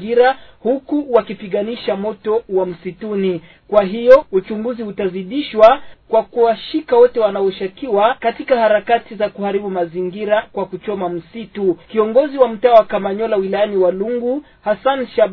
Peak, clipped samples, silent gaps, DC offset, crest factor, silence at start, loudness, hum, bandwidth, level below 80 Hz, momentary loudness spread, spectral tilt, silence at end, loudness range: 0 dBFS; 0.2%; none; under 0.1%; 16 dB; 0 s; -16 LUFS; none; 6 kHz; -50 dBFS; 12 LU; -8 dB/octave; 0 s; 4 LU